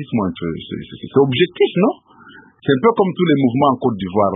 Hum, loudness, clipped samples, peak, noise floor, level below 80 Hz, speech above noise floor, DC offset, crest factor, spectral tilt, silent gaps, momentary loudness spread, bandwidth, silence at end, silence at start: none; -17 LUFS; under 0.1%; 0 dBFS; -44 dBFS; -50 dBFS; 27 dB; under 0.1%; 16 dB; -12 dB/octave; none; 12 LU; 3.9 kHz; 0 s; 0 s